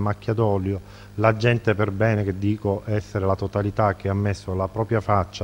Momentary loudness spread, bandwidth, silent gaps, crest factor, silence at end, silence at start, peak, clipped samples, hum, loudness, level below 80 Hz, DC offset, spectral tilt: 6 LU; 9 kHz; none; 20 dB; 0 s; 0 s; -2 dBFS; under 0.1%; none; -23 LUFS; -48 dBFS; under 0.1%; -8 dB/octave